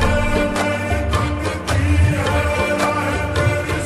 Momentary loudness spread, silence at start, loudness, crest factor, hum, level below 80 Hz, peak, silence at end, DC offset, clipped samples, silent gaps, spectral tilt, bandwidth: 4 LU; 0 s; -19 LUFS; 14 dB; none; -26 dBFS; -4 dBFS; 0 s; under 0.1%; under 0.1%; none; -5.5 dB/octave; 13 kHz